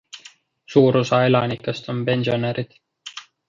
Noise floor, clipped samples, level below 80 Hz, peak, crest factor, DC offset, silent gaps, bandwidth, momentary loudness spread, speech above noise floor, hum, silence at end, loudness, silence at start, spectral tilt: -49 dBFS; under 0.1%; -60 dBFS; -2 dBFS; 18 dB; under 0.1%; none; 7.6 kHz; 21 LU; 30 dB; none; 0.3 s; -20 LUFS; 0.15 s; -6.5 dB/octave